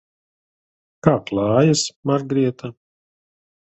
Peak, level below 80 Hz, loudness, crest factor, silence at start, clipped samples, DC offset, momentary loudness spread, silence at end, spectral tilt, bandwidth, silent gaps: 0 dBFS; -54 dBFS; -19 LUFS; 22 dB; 1.05 s; under 0.1%; under 0.1%; 9 LU; 0.95 s; -5.5 dB/octave; 8.4 kHz; 1.96-2.03 s